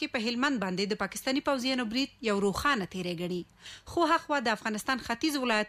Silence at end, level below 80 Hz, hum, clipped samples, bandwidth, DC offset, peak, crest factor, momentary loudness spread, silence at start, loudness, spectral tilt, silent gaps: 0 s; -58 dBFS; none; under 0.1%; 15.5 kHz; under 0.1%; -16 dBFS; 14 dB; 8 LU; 0 s; -30 LUFS; -4 dB/octave; none